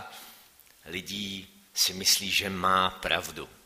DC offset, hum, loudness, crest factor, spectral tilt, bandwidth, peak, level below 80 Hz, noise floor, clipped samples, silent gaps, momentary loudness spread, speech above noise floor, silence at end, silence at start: under 0.1%; none; -26 LUFS; 22 dB; -1.5 dB/octave; 15.5 kHz; -8 dBFS; -60 dBFS; -57 dBFS; under 0.1%; none; 17 LU; 28 dB; 0.15 s; 0 s